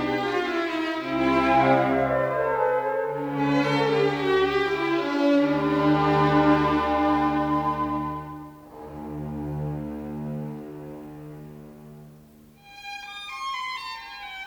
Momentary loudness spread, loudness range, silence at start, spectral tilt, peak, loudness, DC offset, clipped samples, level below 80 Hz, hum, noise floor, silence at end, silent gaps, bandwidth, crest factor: 19 LU; 15 LU; 0 s; -7 dB/octave; -8 dBFS; -24 LUFS; under 0.1%; under 0.1%; -50 dBFS; none; -51 dBFS; 0 s; none; 20 kHz; 16 dB